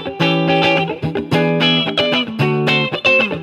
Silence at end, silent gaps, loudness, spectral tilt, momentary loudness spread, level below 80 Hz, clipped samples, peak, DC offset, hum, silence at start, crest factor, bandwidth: 0 s; none; -15 LUFS; -6 dB/octave; 5 LU; -54 dBFS; under 0.1%; -2 dBFS; under 0.1%; none; 0 s; 14 dB; 13 kHz